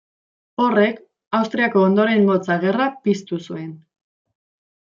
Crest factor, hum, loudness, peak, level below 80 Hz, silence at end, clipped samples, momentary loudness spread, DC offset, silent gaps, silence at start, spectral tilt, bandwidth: 18 dB; none; -19 LUFS; -4 dBFS; -68 dBFS; 1.15 s; under 0.1%; 16 LU; under 0.1%; 1.27-1.31 s; 0.6 s; -7 dB/octave; 7.4 kHz